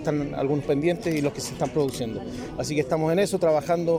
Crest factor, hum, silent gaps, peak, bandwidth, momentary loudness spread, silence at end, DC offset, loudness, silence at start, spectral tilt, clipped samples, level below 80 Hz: 14 dB; none; none; -10 dBFS; 16 kHz; 9 LU; 0 s; under 0.1%; -25 LUFS; 0 s; -6 dB/octave; under 0.1%; -50 dBFS